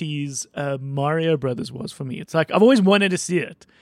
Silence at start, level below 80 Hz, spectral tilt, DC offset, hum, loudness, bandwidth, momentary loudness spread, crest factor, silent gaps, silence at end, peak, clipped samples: 0 s; -62 dBFS; -5.5 dB/octave; under 0.1%; none; -20 LUFS; 13 kHz; 16 LU; 16 dB; none; 0.3 s; -4 dBFS; under 0.1%